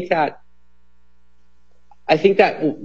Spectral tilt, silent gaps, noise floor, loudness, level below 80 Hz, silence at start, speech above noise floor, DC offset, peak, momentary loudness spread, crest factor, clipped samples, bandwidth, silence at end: -6.5 dB/octave; none; -61 dBFS; -17 LUFS; -62 dBFS; 0 s; 44 dB; 0.8%; 0 dBFS; 10 LU; 20 dB; under 0.1%; 7.2 kHz; 0 s